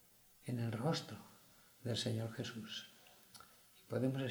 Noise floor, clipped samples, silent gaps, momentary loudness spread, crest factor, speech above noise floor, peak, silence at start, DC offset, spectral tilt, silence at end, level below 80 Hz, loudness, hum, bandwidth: -65 dBFS; under 0.1%; none; 22 LU; 18 dB; 25 dB; -24 dBFS; 0.4 s; under 0.1%; -5.5 dB/octave; 0 s; -78 dBFS; -42 LUFS; none; over 20 kHz